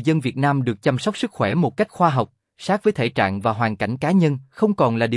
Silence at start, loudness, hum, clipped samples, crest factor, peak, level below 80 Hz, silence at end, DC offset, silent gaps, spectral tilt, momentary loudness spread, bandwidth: 0 s; -21 LUFS; none; under 0.1%; 16 dB; -4 dBFS; -60 dBFS; 0 s; under 0.1%; none; -7 dB/octave; 5 LU; 12 kHz